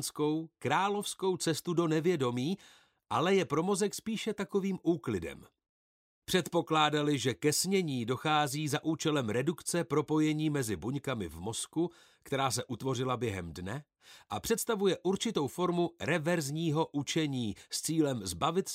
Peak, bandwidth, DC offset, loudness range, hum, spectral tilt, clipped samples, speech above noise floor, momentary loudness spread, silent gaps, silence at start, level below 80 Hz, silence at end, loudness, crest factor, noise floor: -14 dBFS; 16 kHz; under 0.1%; 4 LU; none; -4.5 dB/octave; under 0.1%; over 58 dB; 8 LU; 5.69-6.22 s; 0 s; -64 dBFS; 0 s; -32 LUFS; 18 dB; under -90 dBFS